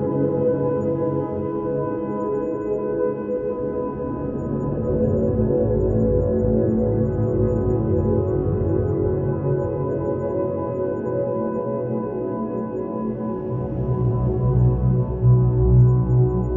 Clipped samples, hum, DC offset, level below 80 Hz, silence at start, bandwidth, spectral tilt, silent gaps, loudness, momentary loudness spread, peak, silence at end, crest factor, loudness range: under 0.1%; none; under 0.1%; -32 dBFS; 0 s; 2.7 kHz; -13 dB/octave; none; -22 LUFS; 8 LU; -6 dBFS; 0 s; 14 dB; 5 LU